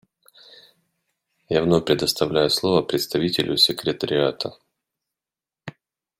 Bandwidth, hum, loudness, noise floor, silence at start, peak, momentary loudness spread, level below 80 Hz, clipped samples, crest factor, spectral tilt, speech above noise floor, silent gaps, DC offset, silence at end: 16.5 kHz; none; -21 LUFS; under -90 dBFS; 1.5 s; -4 dBFS; 18 LU; -56 dBFS; under 0.1%; 20 dB; -4.5 dB/octave; over 69 dB; none; under 0.1%; 0.5 s